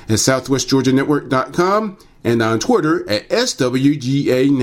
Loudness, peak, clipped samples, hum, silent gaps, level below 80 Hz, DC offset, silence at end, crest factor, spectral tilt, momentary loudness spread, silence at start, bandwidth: -16 LUFS; -2 dBFS; under 0.1%; none; none; -48 dBFS; under 0.1%; 0 s; 14 dB; -5 dB/octave; 4 LU; 0 s; 17 kHz